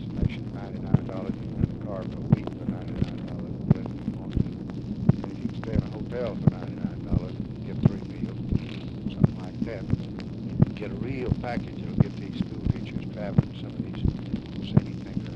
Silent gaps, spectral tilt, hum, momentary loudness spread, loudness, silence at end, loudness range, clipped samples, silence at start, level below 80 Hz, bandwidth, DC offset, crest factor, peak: none; -9.5 dB/octave; none; 9 LU; -29 LUFS; 0 s; 1 LU; under 0.1%; 0 s; -40 dBFS; 7 kHz; under 0.1%; 22 dB; -6 dBFS